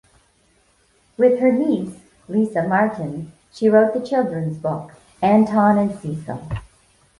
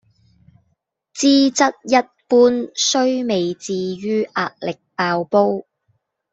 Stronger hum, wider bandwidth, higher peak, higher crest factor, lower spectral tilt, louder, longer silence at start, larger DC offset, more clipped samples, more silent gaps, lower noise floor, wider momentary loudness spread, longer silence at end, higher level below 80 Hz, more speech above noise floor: neither; first, 11.5 kHz vs 8 kHz; about the same, -2 dBFS vs -2 dBFS; about the same, 18 dB vs 18 dB; first, -8.5 dB/octave vs -3.5 dB/octave; about the same, -19 LUFS vs -18 LUFS; about the same, 1.2 s vs 1.15 s; neither; neither; neither; second, -60 dBFS vs -69 dBFS; first, 15 LU vs 10 LU; second, 0.55 s vs 0.7 s; first, -50 dBFS vs -64 dBFS; second, 41 dB vs 52 dB